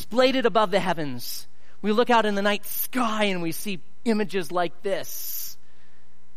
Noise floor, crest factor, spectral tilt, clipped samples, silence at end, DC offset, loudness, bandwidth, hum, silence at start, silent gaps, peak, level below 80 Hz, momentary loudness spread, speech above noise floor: -60 dBFS; 18 dB; -4 dB/octave; under 0.1%; 0.85 s; 4%; -25 LUFS; 15.5 kHz; none; 0 s; none; -8 dBFS; -64 dBFS; 12 LU; 36 dB